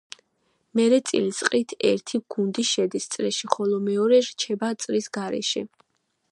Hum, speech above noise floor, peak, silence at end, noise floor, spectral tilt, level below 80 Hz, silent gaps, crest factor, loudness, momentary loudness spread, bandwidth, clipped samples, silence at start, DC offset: none; 50 dB; -2 dBFS; 0.65 s; -73 dBFS; -3.5 dB/octave; -74 dBFS; none; 22 dB; -24 LUFS; 9 LU; 11.5 kHz; under 0.1%; 0.75 s; under 0.1%